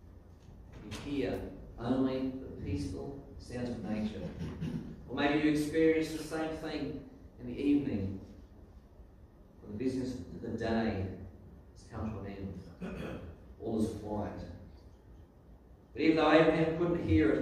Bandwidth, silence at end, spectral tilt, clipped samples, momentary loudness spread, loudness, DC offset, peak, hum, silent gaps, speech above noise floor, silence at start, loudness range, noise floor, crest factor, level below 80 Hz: 13.5 kHz; 0 s; -7 dB/octave; under 0.1%; 20 LU; -34 LUFS; under 0.1%; -10 dBFS; none; none; 24 dB; 0 s; 9 LU; -57 dBFS; 24 dB; -54 dBFS